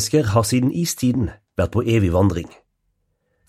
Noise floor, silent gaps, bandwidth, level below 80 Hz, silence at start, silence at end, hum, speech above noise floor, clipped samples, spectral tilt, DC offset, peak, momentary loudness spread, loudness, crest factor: -70 dBFS; none; 15.5 kHz; -40 dBFS; 0 s; 1 s; none; 51 dB; under 0.1%; -6 dB/octave; under 0.1%; -4 dBFS; 8 LU; -20 LUFS; 16 dB